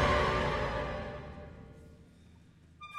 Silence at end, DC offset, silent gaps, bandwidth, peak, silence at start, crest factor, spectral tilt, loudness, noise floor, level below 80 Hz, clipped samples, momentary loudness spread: 0 s; under 0.1%; none; 12.5 kHz; -16 dBFS; 0 s; 18 dB; -5.5 dB/octave; -33 LUFS; -59 dBFS; -44 dBFS; under 0.1%; 24 LU